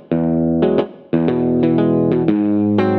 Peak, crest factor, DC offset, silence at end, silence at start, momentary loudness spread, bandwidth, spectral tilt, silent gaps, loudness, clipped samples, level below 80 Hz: -2 dBFS; 12 dB; under 0.1%; 0 s; 0.1 s; 3 LU; 4.9 kHz; -10.5 dB/octave; none; -16 LUFS; under 0.1%; -46 dBFS